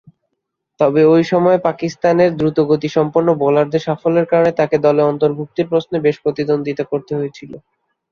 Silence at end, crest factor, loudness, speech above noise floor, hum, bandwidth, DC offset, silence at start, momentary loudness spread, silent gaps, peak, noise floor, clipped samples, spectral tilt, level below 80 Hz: 0.55 s; 14 dB; -15 LUFS; 60 dB; none; 7 kHz; under 0.1%; 0.8 s; 8 LU; none; -2 dBFS; -75 dBFS; under 0.1%; -7.5 dB/octave; -56 dBFS